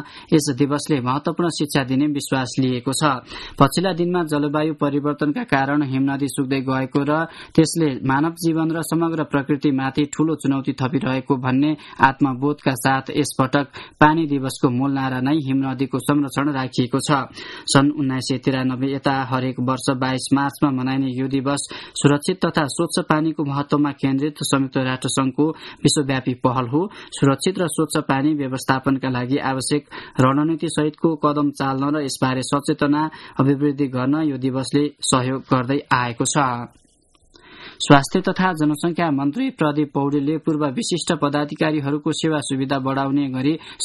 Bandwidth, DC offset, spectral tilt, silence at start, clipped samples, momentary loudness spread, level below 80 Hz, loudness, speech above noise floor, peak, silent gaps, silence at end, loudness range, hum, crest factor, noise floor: 12 kHz; under 0.1%; -5.5 dB/octave; 0 s; under 0.1%; 5 LU; -52 dBFS; -20 LUFS; 37 dB; 0 dBFS; none; 0 s; 1 LU; none; 20 dB; -57 dBFS